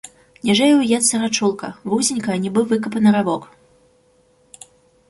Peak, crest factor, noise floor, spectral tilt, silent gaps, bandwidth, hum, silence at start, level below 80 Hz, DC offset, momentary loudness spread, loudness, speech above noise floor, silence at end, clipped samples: -4 dBFS; 16 dB; -57 dBFS; -4 dB/octave; none; 11.5 kHz; none; 0.45 s; -60 dBFS; under 0.1%; 9 LU; -18 LUFS; 40 dB; 1.65 s; under 0.1%